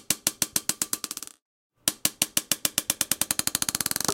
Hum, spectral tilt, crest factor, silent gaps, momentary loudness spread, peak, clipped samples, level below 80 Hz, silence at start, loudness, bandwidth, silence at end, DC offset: none; -0.5 dB/octave; 26 dB; 1.42-1.70 s; 6 LU; -2 dBFS; under 0.1%; -60 dBFS; 0.1 s; -26 LUFS; 17.5 kHz; 0 s; under 0.1%